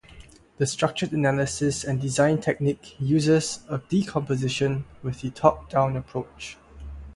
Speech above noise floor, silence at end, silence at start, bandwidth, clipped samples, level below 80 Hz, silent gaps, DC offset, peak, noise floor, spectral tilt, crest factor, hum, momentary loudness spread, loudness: 24 dB; 0 s; 0.1 s; 11.5 kHz; under 0.1%; -48 dBFS; none; under 0.1%; -2 dBFS; -49 dBFS; -5.5 dB/octave; 22 dB; none; 12 LU; -25 LUFS